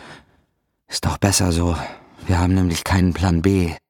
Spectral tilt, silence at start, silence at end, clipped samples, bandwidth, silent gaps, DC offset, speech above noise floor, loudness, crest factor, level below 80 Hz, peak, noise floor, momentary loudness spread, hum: -5 dB/octave; 0 s; 0.1 s; under 0.1%; 18 kHz; none; under 0.1%; 49 dB; -19 LUFS; 18 dB; -34 dBFS; -2 dBFS; -67 dBFS; 10 LU; none